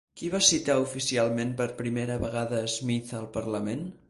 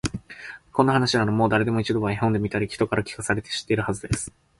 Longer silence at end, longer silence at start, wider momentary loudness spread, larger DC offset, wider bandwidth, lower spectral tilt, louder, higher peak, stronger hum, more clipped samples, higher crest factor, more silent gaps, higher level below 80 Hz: second, 0.15 s vs 0.3 s; about the same, 0.15 s vs 0.05 s; about the same, 10 LU vs 8 LU; neither; about the same, 11.5 kHz vs 11.5 kHz; second, -3.5 dB/octave vs -5.5 dB/octave; second, -28 LUFS vs -24 LUFS; second, -8 dBFS vs -4 dBFS; neither; neither; about the same, 20 dB vs 20 dB; neither; second, -54 dBFS vs -46 dBFS